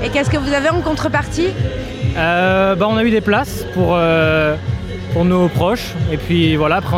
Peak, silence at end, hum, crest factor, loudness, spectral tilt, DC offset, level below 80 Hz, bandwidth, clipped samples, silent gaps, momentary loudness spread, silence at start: -2 dBFS; 0 s; none; 14 dB; -16 LUFS; -6.5 dB/octave; under 0.1%; -32 dBFS; 16 kHz; under 0.1%; none; 8 LU; 0 s